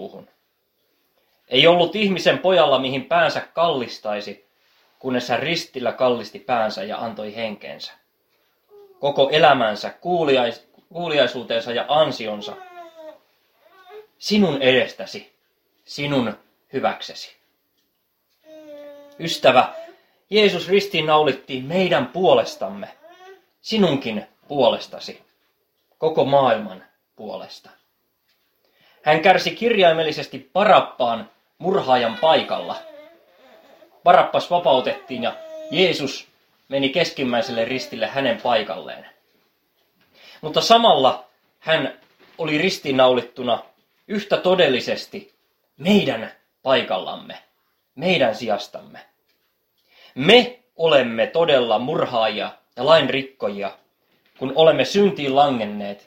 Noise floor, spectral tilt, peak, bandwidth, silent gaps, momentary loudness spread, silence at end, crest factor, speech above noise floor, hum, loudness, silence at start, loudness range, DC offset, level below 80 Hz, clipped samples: -70 dBFS; -5 dB/octave; 0 dBFS; 16.5 kHz; none; 19 LU; 0.1 s; 22 dB; 50 dB; none; -19 LUFS; 0 s; 6 LU; under 0.1%; -64 dBFS; under 0.1%